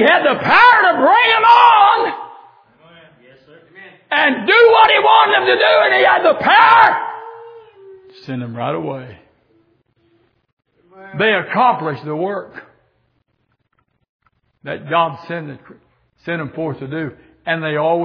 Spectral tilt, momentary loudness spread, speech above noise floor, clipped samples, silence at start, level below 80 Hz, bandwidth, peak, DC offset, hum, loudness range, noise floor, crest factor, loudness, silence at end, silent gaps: -6.5 dB/octave; 20 LU; 51 dB; under 0.1%; 0 s; -60 dBFS; 5.4 kHz; 0 dBFS; under 0.1%; none; 16 LU; -66 dBFS; 16 dB; -12 LUFS; 0 s; 10.53-10.57 s, 14.09-14.19 s